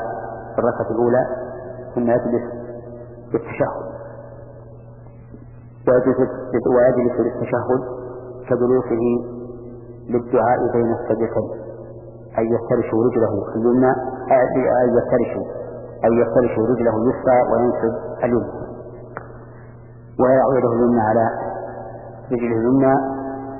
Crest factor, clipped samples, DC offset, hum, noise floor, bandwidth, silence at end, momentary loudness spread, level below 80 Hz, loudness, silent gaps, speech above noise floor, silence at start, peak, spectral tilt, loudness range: 16 dB; under 0.1%; under 0.1%; none; -40 dBFS; 2.9 kHz; 0 s; 19 LU; -46 dBFS; -19 LUFS; none; 22 dB; 0 s; -4 dBFS; -14.5 dB/octave; 5 LU